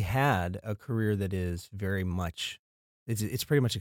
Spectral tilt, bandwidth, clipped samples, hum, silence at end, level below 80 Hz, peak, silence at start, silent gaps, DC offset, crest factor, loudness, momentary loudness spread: -5.5 dB/octave; 17 kHz; under 0.1%; none; 0 s; -52 dBFS; -14 dBFS; 0 s; 2.59-3.06 s; under 0.1%; 16 dB; -31 LUFS; 10 LU